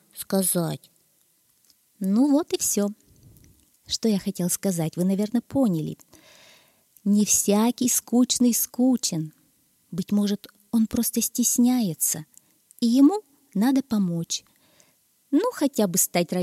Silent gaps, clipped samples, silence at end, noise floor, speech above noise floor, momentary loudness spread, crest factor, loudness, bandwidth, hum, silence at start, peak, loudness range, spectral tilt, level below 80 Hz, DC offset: none; under 0.1%; 0 s; -65 dBFS; 42 dB; 12 LU; 18 dB; -23 LUFS; 16 kHz; none; 0.15 s; -8 dBFS; 4 LU; -4.5 dB/octave; -62 dBFS; under 0.1%